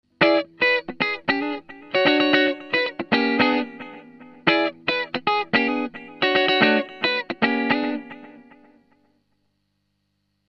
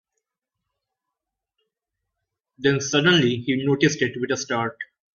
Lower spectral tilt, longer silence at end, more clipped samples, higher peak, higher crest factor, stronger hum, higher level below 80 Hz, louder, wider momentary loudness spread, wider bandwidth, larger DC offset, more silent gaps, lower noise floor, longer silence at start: first, -6 dB/octave vs -4.5 dB/octave; first, 2.15 s vs 0.3 s; neither; about the same, -2 dBFS vs -4 dBFS; about the same, 20 dB vs 20 dB; first, 50 Hz at -60 dBFS vs none; about the same, -64 dBFS vs -62 dBFS; about the same, -21 LUFS vs -21 LUFS; about the same, 11 LU vs 9 LU; about the same, 6.8 kHz vs 7.4 kHz; neither; neither; second, -72 dBFS vs -84 dBFS; second, 0.2 s vs 2.6 s